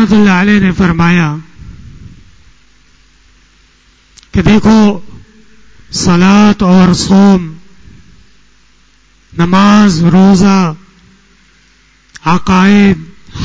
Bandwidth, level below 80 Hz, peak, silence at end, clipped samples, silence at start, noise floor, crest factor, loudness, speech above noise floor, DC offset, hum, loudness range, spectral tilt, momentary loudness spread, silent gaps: 8 kHz; -32 dBFS; 0 dBFS; 0 s; under 0.1%; 0 s; -48 dBFS; 10 dB; -8 LUFS; 41 dB; under 0.1%; none; 6 LU; -6 dB/octave; 13 LU; none